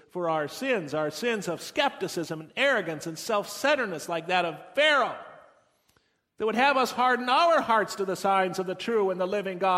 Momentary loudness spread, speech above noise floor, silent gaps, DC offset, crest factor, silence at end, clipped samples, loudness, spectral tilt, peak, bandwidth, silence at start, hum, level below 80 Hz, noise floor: 10 LU; 42 dB; none; under 0.1%; 18 dB; 0 s; under 0.1%; -26 LUFS; -3.5 dB/octave; -8 dBFS; 16 kHz; 0.15 s; none; -72 dBFS; -69 dBFS